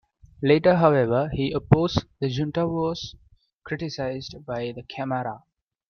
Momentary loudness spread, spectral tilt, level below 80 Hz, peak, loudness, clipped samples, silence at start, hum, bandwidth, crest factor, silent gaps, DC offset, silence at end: 15 LU; -7.5 dB/octave; -48 dBFS; -2 dBFS; -24 LUFS; under 0.1%; 0.4 s; none; 6.8 kHz; 22 dB; 3.53-3.59 s; under 0.1%; 0.55 s